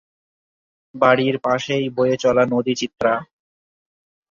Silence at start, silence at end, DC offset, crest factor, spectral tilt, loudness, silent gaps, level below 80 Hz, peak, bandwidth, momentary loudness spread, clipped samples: 0.95 s; 1.05 s; under 0.1%; 20 dB; -5.5 dB/octave; -19 LUFS; none; -58 dBFS; -2 dBFS; 7.4 kHz; 6 LU; under 0.1%